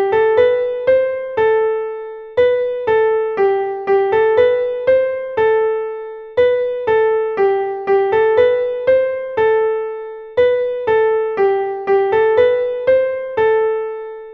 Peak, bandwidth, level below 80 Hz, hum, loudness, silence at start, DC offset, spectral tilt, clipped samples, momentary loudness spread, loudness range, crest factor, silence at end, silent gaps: -2 dBFS; 4.8 kHz; -52 dBFS; none; -16 LUFS; 0 s; under 0.1%; -6.5 dB/octave; under 0.1%; 9 LU; 1 LU; 12 dB; 0 s; none